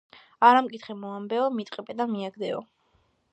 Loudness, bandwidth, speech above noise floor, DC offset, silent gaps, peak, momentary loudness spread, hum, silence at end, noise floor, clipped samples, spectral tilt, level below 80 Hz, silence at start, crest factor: -25 LUFS; 8.4 kHz; 43 dB; under 0.1%; none; -4 dBFS; 17 LU; none; 0.7 s; -68 dBFS; under 0.1%; -6 dB/octave; -78 dBFS; 0.4 s; 22 dB